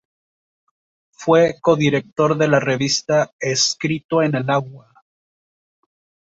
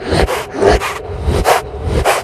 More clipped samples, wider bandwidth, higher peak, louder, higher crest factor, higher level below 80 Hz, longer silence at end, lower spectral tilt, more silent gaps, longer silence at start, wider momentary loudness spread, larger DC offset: neither; second, 8 kHz vs 14 kHz; about the same, -2 dBFS vs 0 dBFS; second, -18 LUFS vs -15 LUFS; about the same, 18 dB vs 14 dB; second, -60 dBFS vs -22 dBFS; first, 1.55 s vs 0 s; about the same, -4.5 dB/octave vs -5 dB/octave; first, 3.33-3.39 s, 4.05-4.09 s vs none; first, 1.2 s vs 0 s; about the same, 6 LU vs 7 LU; neither